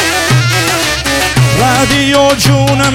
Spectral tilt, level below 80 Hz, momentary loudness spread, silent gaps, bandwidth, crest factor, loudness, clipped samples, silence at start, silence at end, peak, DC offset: -4 dB/octave; -28 dBFS; 3 LU; none; 17 kHz; 10 dB; -9 LUFS; under 0.1%; 0 s; 0 s; 0 dBFS; under 0.1%